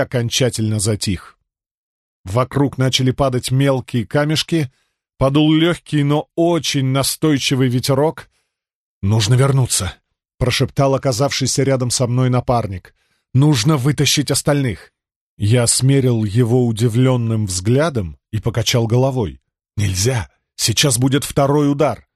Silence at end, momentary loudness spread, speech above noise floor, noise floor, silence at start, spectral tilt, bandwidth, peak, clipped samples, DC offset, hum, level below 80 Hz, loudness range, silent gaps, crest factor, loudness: 0.2 s; 9 LU; 55 dB; -71 dBFS; 0 s; -5 dB/octave; 13 kHz; 0 dBFS; under 0.1%; under 0.1%; none; -42 dBFS; 3 LU; 1.71-2.24 s, 8.75-9.01 s, 15.16-15.37 s; 16 dB; -17 LUFS